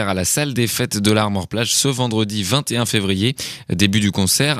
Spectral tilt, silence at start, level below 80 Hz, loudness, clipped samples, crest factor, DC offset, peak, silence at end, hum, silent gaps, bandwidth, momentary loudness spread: -4 dB/octave; 0 s; -48 dBFS; -18 LUFS; under 0.1%; 18 dB; under 0.1%; 0 dBFS; 0 s; none; none; 15 kHz; 5 LU